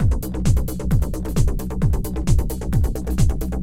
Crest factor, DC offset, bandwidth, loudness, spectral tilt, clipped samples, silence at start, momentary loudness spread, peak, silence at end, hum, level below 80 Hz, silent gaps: 14 dB; 3%; 16.5 kHz; -22 LUFS; -7 dB/octave; under 0.1%; 0 s; 2 LU; -4 dBFS; 0 s; none; -22 dBFS; none